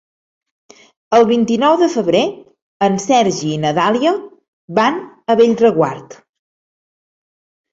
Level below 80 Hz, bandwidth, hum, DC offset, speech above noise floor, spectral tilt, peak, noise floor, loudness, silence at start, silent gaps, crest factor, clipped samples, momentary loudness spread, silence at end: -58 dBFS; 7.8 kHz; none; under 0.1%; over 76 dB; -5 dB/octave; 0 dBFS; under -90 dBFS; -15 LUFS; 1.1 s; 2.62-2.80 s, 4.48-4.68 s; 16 dB; under 0.1%; 8 LU; 1.6 s